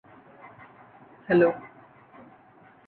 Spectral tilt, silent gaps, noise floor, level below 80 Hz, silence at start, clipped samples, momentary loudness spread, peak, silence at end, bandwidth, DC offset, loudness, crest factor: -10 dB/octave; none; -55 dBFS; -68 dBFS; 1.3 s; under 0.1%; 28 LU; -10 dBFS; 1.2 s; 4.4 kHz; under 0.1%; -24 LUFS; 20 dB